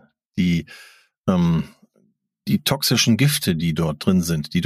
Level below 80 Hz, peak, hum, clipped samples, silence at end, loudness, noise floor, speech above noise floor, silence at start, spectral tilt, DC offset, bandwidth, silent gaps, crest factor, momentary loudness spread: -46 dBFS; -4 dBFS; none; under 0.1%; 0 s; -20 LUFS; -64 dBFS; 44 dB; 0.35 s; -5 dB/octave; under 0.1%; 15.5 kHz; 1.17-1.24 s; 16 dB; 13 LU